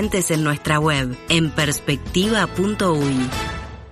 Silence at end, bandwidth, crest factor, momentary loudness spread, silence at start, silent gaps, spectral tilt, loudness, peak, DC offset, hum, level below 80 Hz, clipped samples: 0 s; 14 kHz; 18 dB; 5 LU; 0 s; none; -4.5 dB/octave; -20 LUFS; -2 dBFS; under 0.1%; none; -38 dBFS; under 0.1%